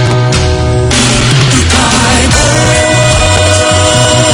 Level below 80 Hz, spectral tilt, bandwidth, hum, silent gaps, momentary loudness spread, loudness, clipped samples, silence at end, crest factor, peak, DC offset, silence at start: -20 dBFS; -3.5 dB/octave; 17 kHz; none; none; 3 LU; -7 LUFS; 1%; 0 s; 8 dB; 0 dBFS; under 0.1%; 0 s